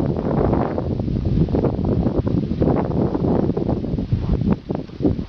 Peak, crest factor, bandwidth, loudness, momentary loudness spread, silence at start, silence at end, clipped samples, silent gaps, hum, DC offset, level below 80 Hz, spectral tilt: -6 dBFS; 14 dB; 6.2 kHz; -21 LUFS; 4 LU; 0 s; 0 s; under 0.1%; none; none; under 0.1%; -30 dBFS; -11 dB/octave